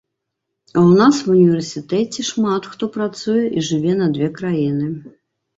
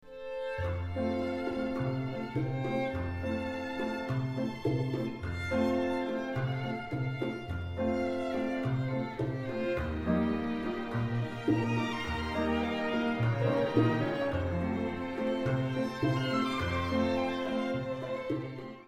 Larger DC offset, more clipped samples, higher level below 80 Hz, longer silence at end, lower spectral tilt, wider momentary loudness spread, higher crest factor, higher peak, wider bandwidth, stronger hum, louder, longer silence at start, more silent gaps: neither; neither; second, -58 dBFS vs -50 dBFS; first, 0.5 s vs 0.05 s; about the same, -6.5 dB/octave vs -7.5 dB/octave; first, 10 LU vs 6 LU; about the same, 16 dB vs 18 dB; first, -2 dBFS vs -14 dBFS; second, 8 kHz vs 12.5 kHz; neither; first, -17 LUFS vs -33 LUFS; first, 0.75 s vs 0.05 s; neither